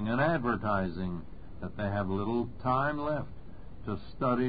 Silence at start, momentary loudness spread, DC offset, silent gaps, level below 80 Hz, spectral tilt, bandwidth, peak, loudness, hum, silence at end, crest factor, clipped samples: 0 s; 16 LU; 0.7%; none; -50 dBFS; -11 dB/octave; 5 kHz; -16 dBFS; -32 LUFS; none; 0 s; 18 dB; under 0.1%